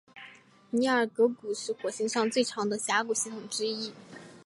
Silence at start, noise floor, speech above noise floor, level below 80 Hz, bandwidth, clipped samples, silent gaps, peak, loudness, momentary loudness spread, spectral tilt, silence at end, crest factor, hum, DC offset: 0.15 s; -54 dBFS; 25 dB; -78 dBFS; 11.5 kHz; under 0.1%; none; -12 dBFS; -29 LUFS; 21 LU; -2.5 dB/octave; 0.05 s; 18 dB; none; under 0.1%